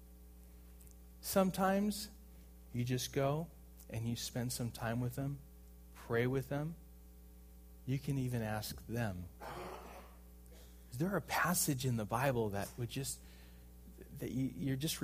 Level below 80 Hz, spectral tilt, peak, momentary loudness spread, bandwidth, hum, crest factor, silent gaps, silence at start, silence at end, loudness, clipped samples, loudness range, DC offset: -58 dBFS; -5 dB/octave; -18 dBFS; 25 LU; 15.5 kHz; none; 22 dB; none; 0 s; 0 s; -38 LUFS; under 0.1%; 5 LU; under 0.1%